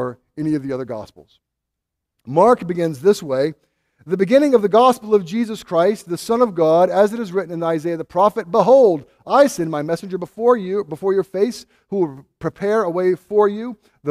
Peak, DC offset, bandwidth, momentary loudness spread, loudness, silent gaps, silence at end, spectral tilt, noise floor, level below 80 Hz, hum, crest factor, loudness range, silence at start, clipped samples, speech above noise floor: 0 dBFS; under 0.1%; 15 kHz; 13 LU; -18 LUFS; none; 0 s; -6.5 dB/octave; -80 dBFS; -60 dBFS; none; 18 dB; 4 LU; 0 s; under 0.1%; 63 dB